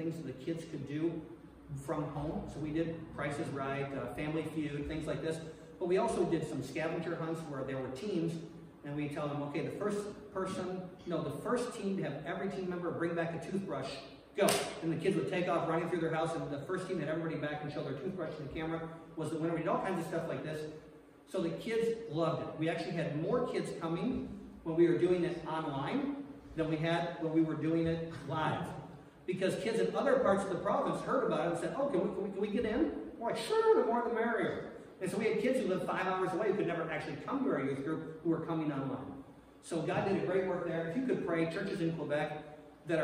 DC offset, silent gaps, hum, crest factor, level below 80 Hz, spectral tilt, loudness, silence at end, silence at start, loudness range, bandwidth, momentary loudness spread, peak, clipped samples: under 0.1%; none; none; 20 dB; -62 dBFS; -6 dB/octave; -36 LUFS; 0 s; 0 s; 5 LU; 15.5 kHz; 9 LU; -16 dBFS; under 0.1%